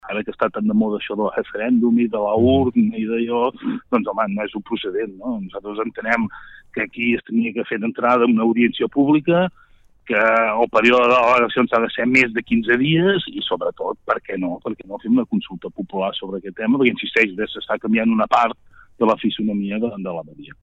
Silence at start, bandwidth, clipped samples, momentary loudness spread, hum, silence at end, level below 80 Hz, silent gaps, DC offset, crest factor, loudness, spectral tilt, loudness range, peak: 0.05 s; 8 kHz; under 0.1%; 12 LU; none; 0.15 s; -54 dBFS; none; under 0.1%; 18 dB; -19 LUFS; -7 dB/octave; 7 LU; -2 dBFS